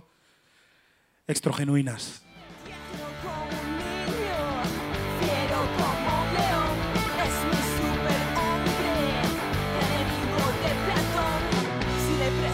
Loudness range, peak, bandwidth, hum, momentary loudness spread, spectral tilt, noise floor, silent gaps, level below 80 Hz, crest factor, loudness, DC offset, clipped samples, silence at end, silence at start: 6 LU; -10 dBFS; 16 kHz; none; 10 LU; -5 dB/octave; -65 dBFS; none; -40 dBFS; 18 dB; -27 LUFS; under 0.1%; under 0.1%; 0 s; 1.3 s